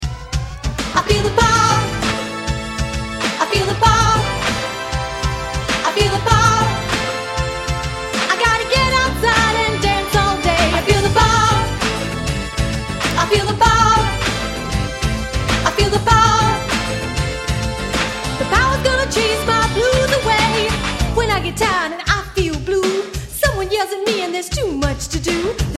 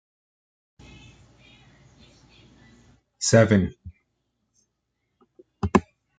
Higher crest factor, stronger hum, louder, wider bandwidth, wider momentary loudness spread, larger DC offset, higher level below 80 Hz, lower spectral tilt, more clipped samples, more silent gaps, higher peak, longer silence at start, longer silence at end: second, 16 dB vs 26 dB; neither; first, -17 LUFS vs -22 LUFS; first, 15.5 kHz vs 9.4 kHz; second, 9 LU vs 13 LU; neither; first, -26 dBFS vs -52 dBFS; second, -4 dB/octave vs -5.5 dB/octave; neither; neither; about the same, 0 dBFS vs -2 dBFS; second, 0 s vs 3.2 s; second, 0 s vs 0.4 s